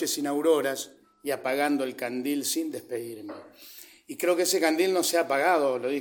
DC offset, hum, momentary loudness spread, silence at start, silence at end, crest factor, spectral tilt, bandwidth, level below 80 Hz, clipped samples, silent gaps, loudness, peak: under 0.1%; none; 18 LU; 0 s; 0 s; 18 dB; -2.5 dB/octave; 17.5 kHz; -82 dBFS; under 0.1%; none; -26 LUFS; -10 dBFS